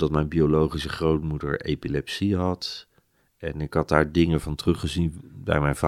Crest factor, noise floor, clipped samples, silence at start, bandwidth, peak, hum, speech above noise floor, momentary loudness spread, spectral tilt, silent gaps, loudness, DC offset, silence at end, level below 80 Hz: 22 dB; -65 dBFS; under 0.1%; 0 s; 14 kHz; -2 dBFS; none; 41 dB; 11 LU; -6.5 dB/octave; none; -25 LUFS; under 0.1%; 0 s; -40 dBFS